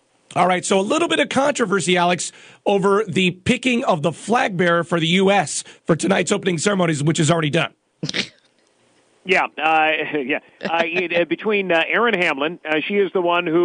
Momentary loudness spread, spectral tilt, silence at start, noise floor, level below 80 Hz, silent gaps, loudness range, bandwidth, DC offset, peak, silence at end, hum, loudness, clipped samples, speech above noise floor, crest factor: 7 LU; -4.5 dB/octave; 0.3 s; -59 dBFS; -58 dBFS; none; 3 LU; 10.5 kHz; under 0.1%; -4 dBFS; 0 s; none; -19 LUFS; under 0.1%; 41 dB; 16 dB